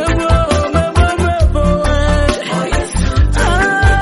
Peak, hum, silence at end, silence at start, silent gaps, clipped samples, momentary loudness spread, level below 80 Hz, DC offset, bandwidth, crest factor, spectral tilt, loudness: 0 dBFS; none; 0 s; 0 s; none; under 0.1%; 4 LU; -16 dBFS; under 0.1%; 11.5 kHz; 12 dB; -5.5 dB/octave; -14 LUFS